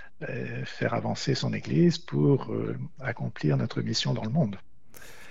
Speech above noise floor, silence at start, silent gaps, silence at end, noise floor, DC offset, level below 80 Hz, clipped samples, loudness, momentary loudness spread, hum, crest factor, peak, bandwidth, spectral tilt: 24 dB; 0 s; none; 0 s; -51 dBFS; 0.9%; -56 dBFS; under 0.1%; -28 LUFS; 11 LU; none; 16 dB; -12 dBFS; 14.5 kHz; -6 dB/octave